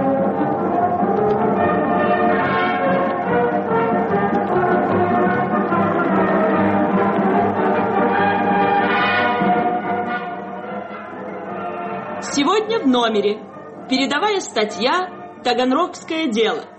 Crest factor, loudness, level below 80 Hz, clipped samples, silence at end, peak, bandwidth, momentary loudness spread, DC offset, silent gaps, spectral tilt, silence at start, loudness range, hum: 12 dB; -18 LUFS; -56 dBFS; under 0.1%; 0 s; -6 dBFS; 8.4 kHz; 10 LU; under 0.1%; none; -5.5 dB/octave; 0 s; 4 LU; none